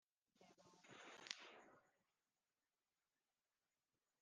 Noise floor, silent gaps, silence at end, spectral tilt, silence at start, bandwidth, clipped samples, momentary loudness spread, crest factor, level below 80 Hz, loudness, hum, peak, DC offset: under -90 dBFS; none; 2.25 s; -1 dB/octave; 0.35 s; 9.4 kHz; under 0.1%; 11 LU; 42 dB; under -90 dBFS; -58 LUFS; none; -24 dBFS; under 0.1%